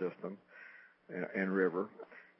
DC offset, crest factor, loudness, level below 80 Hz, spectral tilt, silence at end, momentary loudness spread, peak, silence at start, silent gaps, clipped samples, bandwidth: under 0.1%; 22 dB; -37 LUFS; under -90 dBFS; -7 dB/octave; 0.15 s; 21 LU; -18 dBFS; 0 s; none; under 0.1%; 5.6 kHz